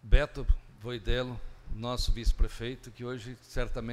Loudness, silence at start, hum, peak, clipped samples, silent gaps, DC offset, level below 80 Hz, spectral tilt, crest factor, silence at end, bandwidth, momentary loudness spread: -35 LUFS; 0.05 s; none; -8 dBFS; under 0.1%; none; under 0.1%; -30 dBFS; -5.5 dB/octave; 22 dB; 0 s; 12.5 kHz; 10 LU